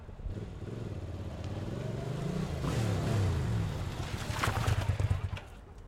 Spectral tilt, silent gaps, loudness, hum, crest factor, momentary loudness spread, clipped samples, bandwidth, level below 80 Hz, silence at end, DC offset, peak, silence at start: -6 dB/octave; none; -35 LUFS; none; 18 dB; 11 LU; under 0.1%; 16 kHz; -44 dBFS; 0 s; under 0.1%; -16 dBFS; 0 s